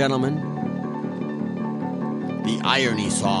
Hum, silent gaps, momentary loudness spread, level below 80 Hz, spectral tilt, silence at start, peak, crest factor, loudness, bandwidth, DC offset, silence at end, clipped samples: none; none; 8 LU; -58 dBFS; -4.5 dB/octave; 0 s; -2 dBFS; 20 dB; -24 LUFS; 11.5 kHz; under 0.1%; 0 s; under 0.1%